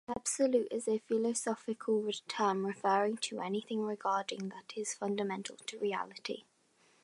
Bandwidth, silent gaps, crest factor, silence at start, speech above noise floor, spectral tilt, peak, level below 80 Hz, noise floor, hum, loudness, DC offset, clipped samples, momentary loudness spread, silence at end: 11.5 kHz; none; 18 dB; 0.1 s; 35 dB; -3.5 dB/octave; -16 dBFS; -78 dBFS; -70 dBFS; none; -35 LUFS; under 0.1%; under 0.1%; 10 LU; 0.65 s